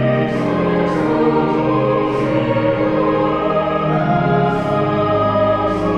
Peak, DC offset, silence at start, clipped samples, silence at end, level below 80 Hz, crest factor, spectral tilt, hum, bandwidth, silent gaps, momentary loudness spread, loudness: -4 dBFS; 0.3%; 0 s; under 0.1%; 0 s; -40 dBFS; 12 dB; -8.5 dB/octave; none; 9 kHz; none; 2 LU; -16 LUFS